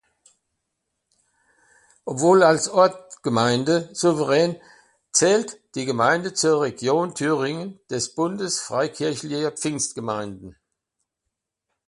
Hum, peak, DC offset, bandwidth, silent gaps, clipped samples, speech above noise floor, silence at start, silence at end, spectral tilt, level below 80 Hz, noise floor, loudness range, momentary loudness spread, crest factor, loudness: none; -2 dBFS; under 0.1%; 11.5 kHz; none; under 0.1%; 61 dB; 2.05 s; 1.35 s; -4 dB/octave; -64 dBFS; -82 dBFS; 6 LU; 13 LU; 20 dB; -22 LUFS